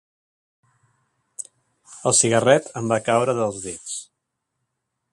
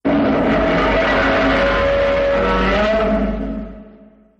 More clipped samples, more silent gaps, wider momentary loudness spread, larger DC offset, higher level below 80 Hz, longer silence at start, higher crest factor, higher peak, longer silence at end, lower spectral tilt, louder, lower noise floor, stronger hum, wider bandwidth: neither; neither; first, 20 LU vs 8 LU; neither; second, -62 dBFS vs -28 dBFS; first, 1.4 s vs 0.05 s; first, 24 dB vs 12 dB; first, -2 dBFS vs -6 dBFS; first, 1.1 s vs 0.55 s; second, -3.5 dB/octave vs -6.5 dB/octave; second, -20 LUFS vs -16 LUFS; first, -79 dBFS vs -45 dBFS; neither; first, 11.5 kHz vs 8.2 kHz